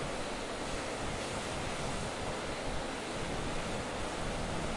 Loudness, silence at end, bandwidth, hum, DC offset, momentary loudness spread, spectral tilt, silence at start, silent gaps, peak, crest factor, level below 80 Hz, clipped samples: -37 LUFS; 0 s; 11.5 kHz; none; under 0.1%; 1 LU; -4 dB/octave; 0 s; none; -24 dBFS; 14 dB; -46 dBFS; under 0.1%